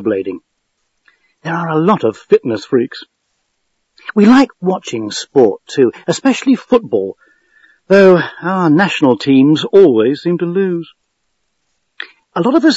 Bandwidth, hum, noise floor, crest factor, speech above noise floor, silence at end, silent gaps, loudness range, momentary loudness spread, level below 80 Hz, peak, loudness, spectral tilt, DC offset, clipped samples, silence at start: 8 kHz; none; -69 dBFS; 14 dB; 57 dB; 0 s; none; 6 LU; 15 LU; -60 dBFS; 0 dBFS; -13 LUFS; -6 dB/octave; under 0.1%; 0.3%; 0 s